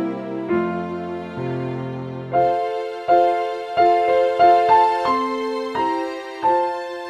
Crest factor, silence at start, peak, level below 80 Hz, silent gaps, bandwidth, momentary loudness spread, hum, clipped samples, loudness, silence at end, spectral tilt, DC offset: 16 dB; 0 s; -4 dBFS; -58 dBFS; none; 10 kHz; 13 LU; none; under 0.1%; -20 LUFS; 0 s; -6.5 dB/octave; under 0.1%